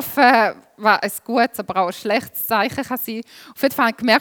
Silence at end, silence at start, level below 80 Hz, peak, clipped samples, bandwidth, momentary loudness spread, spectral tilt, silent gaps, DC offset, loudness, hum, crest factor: 0 s; 0 s; -64 dBFS; 0 dBFS; under 0.1%; over 20 kHz; 11 LU; -3.5 dB/octave; none; under 0.1%; -19 LUFS; none; 20 dB